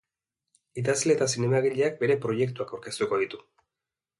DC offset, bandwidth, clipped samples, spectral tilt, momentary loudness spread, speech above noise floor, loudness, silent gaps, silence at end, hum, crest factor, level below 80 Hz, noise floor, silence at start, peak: under 0.1%; 11.5 kHz; under 0.1%; -4.5 dB/octave; 11 LU; 63 dB; -27 LUFS; none; 0.8 s; none; 16 dB; -68 dBFS; -89 dBFS; 0.75 s; -10 dBFS